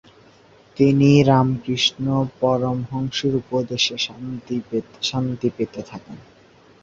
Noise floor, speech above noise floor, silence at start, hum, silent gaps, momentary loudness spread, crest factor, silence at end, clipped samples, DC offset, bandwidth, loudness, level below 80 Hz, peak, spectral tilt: -51 dBFS; 31 dB; 0.75 s; none; none; 14 LU; 20 dB; 0.6 s; under 0.1%; under 0.1%; 7.6 kHz; -20 LUFS; -52 dBFS; -2 dBFS; -6 dB/octave